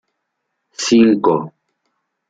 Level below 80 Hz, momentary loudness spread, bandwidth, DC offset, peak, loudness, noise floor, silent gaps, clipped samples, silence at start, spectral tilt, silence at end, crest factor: -58 dBFS; 22 LU; 9 kHz; under 0.1%; -2 dBFS; -14 LUFS; -74 dBFS; none; under 0.1%; 0.8 s; -4.5 dB/octave; 0.8 s; 16 dB